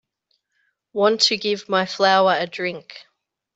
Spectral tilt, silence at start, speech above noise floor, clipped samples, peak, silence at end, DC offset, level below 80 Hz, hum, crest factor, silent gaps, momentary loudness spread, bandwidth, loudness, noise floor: -3 dB/octave; 0.95 s; 52 dB; under 0.1%; -2 dBFS; 0.55 s; under 0.1%; -72 dBFS; none; 20 dB; none; 11 LU; 8.2 kHz; -19 LUFS; -71 dBFS